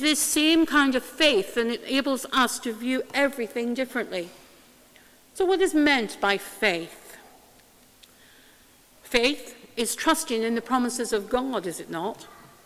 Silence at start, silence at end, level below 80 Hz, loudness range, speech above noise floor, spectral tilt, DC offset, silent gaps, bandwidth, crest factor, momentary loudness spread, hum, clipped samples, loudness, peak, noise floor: 0 s; 0.25 s; -58 dBFS; 6 LU; 31 dB; -2 dB/octave; under 0.1%; none; 16 kHz; 24 dB; 12 LU; none; under 0.1%; -24 LUFS; -2 dBFS; -56 dBFS